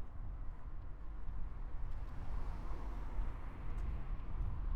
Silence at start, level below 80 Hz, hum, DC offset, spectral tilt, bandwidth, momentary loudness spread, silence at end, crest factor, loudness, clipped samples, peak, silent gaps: 0 s; -42 dBFS; none; under 0.1%; -8 dB/octave; 4.5 kHz; 6 LU; 0 s; 12 dB; -48 LUFS; under 0.1%; -28 dBFS; none